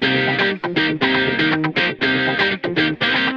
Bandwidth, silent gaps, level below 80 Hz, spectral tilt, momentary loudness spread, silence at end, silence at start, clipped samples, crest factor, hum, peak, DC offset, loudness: 7.2 kHz; none; -52 dBFS; -6 dB/octave; 2 LU; 0 s; 0 s; under 0.1%; 14 dB; none; -4 dBFS; under 0.1%; -17 LUFS